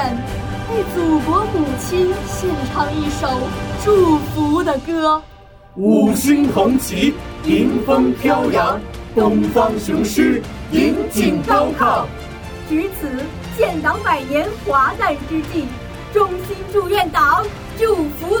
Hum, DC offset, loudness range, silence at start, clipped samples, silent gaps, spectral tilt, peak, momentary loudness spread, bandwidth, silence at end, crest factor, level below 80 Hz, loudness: none; under 0.1%; 3 LU; 0 s; under 0.1%; none; -5.5 dB/octave; -2 dBFS; 10 LU; over 20 kHz; 0 s; 14 dB; -36 dBFS; -17 LUFS